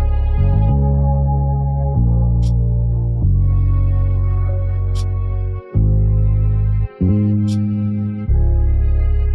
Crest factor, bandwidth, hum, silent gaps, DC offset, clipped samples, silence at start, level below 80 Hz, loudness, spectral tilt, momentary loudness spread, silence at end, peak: 10 dB; 6 kHz; none; none; under 0.1%; under 0.1%; 0 s; -18 dBFS; -17 LUFS; -10.5 dB/octave; 4 LU; 0 s; -4 dBFS